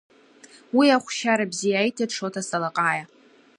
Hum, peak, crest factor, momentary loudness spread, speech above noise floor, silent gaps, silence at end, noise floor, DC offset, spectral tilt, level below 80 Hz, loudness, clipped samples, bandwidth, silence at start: none; -6 dBFS; 18 dB; 9 LU; 29 dB; none; 0.55 s; -51 dBFS; under 0.1%; -3.5 dB/octave; -78 dBFS; -23 LUFS; under 0.1%; 11 kHz; 0.75 s